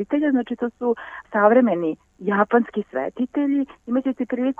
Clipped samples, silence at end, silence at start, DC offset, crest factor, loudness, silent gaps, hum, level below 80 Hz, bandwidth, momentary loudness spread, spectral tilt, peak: under 0.1%; 0.05 s; 0 s; under 0.1%; 18 dB; -22 LUFS; none; none; -62 dBFS; 3.6 kHz; 11 LU; -8.5 dB/octave; -4 dBFS